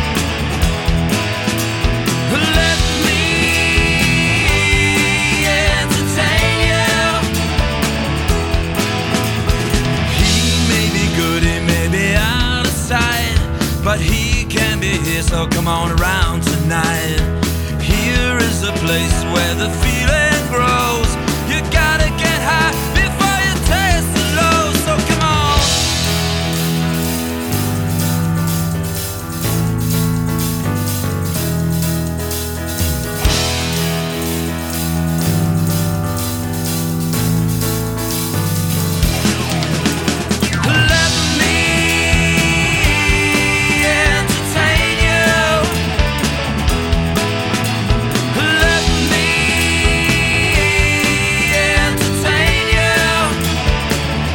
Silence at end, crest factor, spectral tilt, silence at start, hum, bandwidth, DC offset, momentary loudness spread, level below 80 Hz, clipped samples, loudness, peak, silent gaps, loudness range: 0 s; 14 dB; -4 dB/octave; 0 s; none; over 20 kHz; under 0.1%; 6 LU; -24 dBFS; under 0.1%; -15 LUFS; 0 dBFS; none; 5 LU